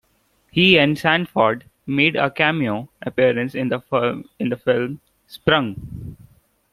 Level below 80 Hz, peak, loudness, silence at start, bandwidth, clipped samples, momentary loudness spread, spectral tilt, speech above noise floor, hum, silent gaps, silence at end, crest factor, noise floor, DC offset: -52 dBFS; 0 dBFS; -19 LUFS; 0.55 s; 14.5 kHz; under 0.1%; 14 LU; -6.5 dB/octave; 44 dB; none; none; 0.6 s; 20 dB; -63 dBFS; under 0.1%